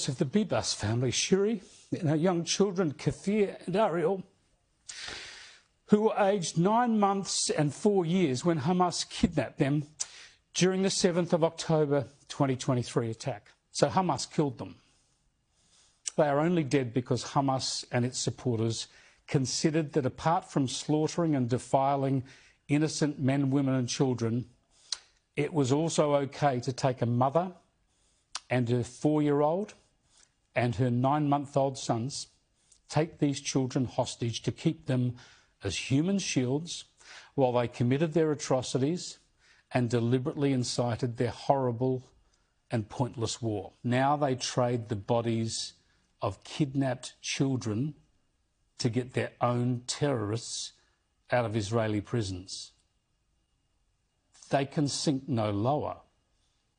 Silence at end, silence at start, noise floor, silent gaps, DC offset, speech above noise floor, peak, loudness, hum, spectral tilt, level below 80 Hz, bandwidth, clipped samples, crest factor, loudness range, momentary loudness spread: 0.8 s; 0 s; -74 dBFS; none; under 0.1%; 46 dB; -8 dBFS; -30 LUFS; none; -5.5 dB/octave; -62 dBFS; 10 kHz; under 0.1%; 22 dB; 4 LU; 11 LU